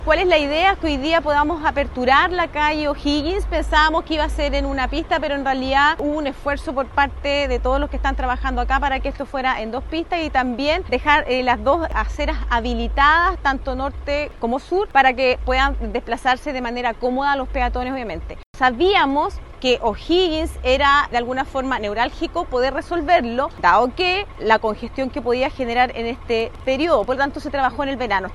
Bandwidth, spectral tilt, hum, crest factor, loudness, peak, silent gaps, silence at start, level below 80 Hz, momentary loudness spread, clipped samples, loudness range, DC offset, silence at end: 12 kHz; -5 dB/octave; none; 18 dB; -19 LUFS; 0 dBFS; 18.46-18.54 s; 0 s; -30 dBFS; 8 LU; under 0.1%; 3 LU; under 0.1%; 0 s